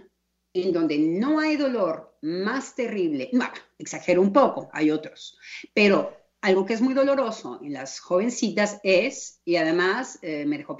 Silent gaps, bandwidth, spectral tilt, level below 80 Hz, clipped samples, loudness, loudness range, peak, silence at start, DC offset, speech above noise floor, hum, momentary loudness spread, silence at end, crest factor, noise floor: none; 8 kHz; -5 dB/octave; -72 dBFS; under 0.1%; -24 LUFS; 2 LU; -6 dBFS; 0.55 s; under 0.1%; 40 dB; none; 14 LU; 0 s; 18 dB; -64 dBFS